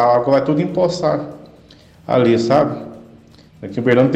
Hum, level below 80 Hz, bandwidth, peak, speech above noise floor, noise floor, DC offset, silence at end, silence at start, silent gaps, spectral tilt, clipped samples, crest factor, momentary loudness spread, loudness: none; -52 dBFS; 8.8 kHz; -4 dBFS; 30 dB; -45 dBFS; under 0.1%; 0 s; 0 s; none; -7 dB/octave; under 0.1%; 14 dB; 19 LU; -16 LUFS